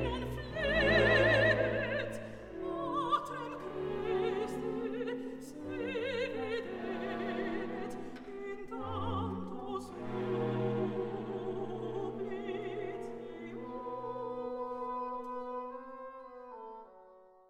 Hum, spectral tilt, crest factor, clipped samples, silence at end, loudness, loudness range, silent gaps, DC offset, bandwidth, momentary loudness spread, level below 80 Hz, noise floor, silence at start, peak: none; -6.5 dB/octave; 20 dB; under 0.1%; 0.2 s; -35 LUFS; 10 LU; none; under 0.1%; 15 kHz; 16 LU; -54 dBFS; -59 dBFS; 0 s; -16 dBFS